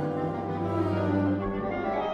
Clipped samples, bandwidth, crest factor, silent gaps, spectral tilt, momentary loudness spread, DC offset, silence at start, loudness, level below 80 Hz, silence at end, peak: under 0.1%; 7 kHz; 12 dB; none; -9 dB/octave; 5 LU; under 0.1%; 0 s; -29 LUFS; -50 dBFS; 0 s; -16 dBFS